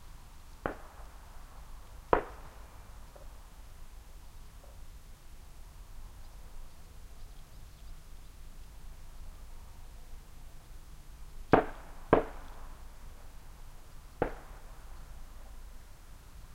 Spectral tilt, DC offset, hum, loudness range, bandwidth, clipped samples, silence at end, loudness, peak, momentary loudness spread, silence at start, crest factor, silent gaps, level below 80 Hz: -6.5 dB/octave; under 0.1%; none; 19 LU; 16 kHz; under 0.1%; 0 s; -33 LUFS; -6 dBFS; 23 LU; 0 s; 34 dB; none; -46 dBFS